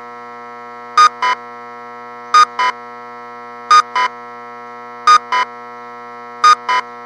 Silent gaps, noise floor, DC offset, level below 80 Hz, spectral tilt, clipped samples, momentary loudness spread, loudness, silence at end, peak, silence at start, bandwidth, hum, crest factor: none; -32 dBFS; under 0.1%; -78 dBFS; 0.5 dB/octave; under 0.1%; 21 LU; -13 LUFS; 0 s; 0 dBFS; 0 s; 10.5 kHz; none; 16 dB